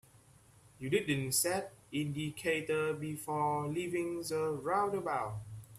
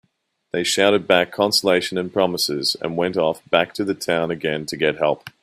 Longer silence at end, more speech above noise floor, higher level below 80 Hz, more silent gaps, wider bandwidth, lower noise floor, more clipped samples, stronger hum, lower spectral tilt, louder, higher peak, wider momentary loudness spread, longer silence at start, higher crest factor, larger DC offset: second, 0 s vs 0.15 s; second, 28 dB vs 49 dB; second, -68 dBFS vs -60 dBFS; neither; about the same, 15.5 kHz vs 15.5 kHz; second, -62 dBFS vs -69 dBFS; neither; neither; about the same, -4.5 dB/octave vs -3.5 dB/octave; second, -35 LUFS vs -20 LUFS; second, -18 dBFS vs 0 dBFS; about the same, 8 LU vs 7 LU; second, 0.15 s vs 0.55 s; about the same, 18 dB vs 20 dB; neither